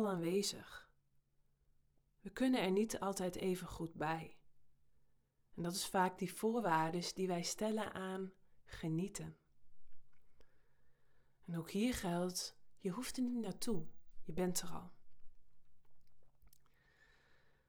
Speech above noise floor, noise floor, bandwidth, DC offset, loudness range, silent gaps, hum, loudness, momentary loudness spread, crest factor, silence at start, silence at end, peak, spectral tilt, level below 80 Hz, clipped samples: 36 dB; -75 dBFS; over 20 kHz; under 0.1%; 9 LU; none; none; -40 LUFS; 17 LU; 20 dB; 0 s; 0.2 s; -22 dBFS; -4.5 dB/octave; -64 dBFS; under 0.1%